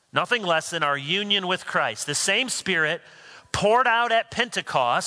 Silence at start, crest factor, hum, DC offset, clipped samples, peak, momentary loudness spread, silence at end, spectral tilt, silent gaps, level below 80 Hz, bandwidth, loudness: 0.15 s; 20 dB; none; under 0.1%; under 0.1%; -4 dBFS; 6 LU; 0 s; -2 dB/octave; none; -58 dBFS; 11 kHz; -23 LUFS